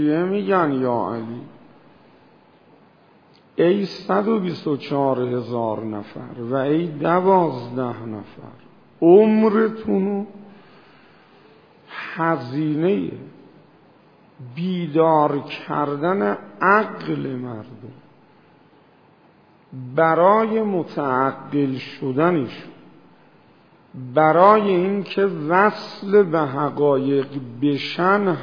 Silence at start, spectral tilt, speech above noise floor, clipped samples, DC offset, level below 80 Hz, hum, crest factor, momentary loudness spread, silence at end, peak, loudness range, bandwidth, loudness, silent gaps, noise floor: 0 s; -9 dB/octave; 34 dB; under 0.1%; under 0.1%; -68 dBFS; none; 20 dB; 16 LU; 0 s; 0 dBFS; 8 LU; 5.4 kHz; -20 LUFS; none; -53 dBFS